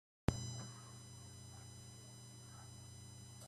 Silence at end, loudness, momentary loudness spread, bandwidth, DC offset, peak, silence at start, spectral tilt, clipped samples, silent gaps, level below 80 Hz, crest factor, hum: 0 s; -50 LUFS; 13 LU; 14.5 kHz; under 0.1%; -14 dBFS; 0.3 s; -5 dB/octave; under 0.1%; none; -60 dBFS; 34 dB; none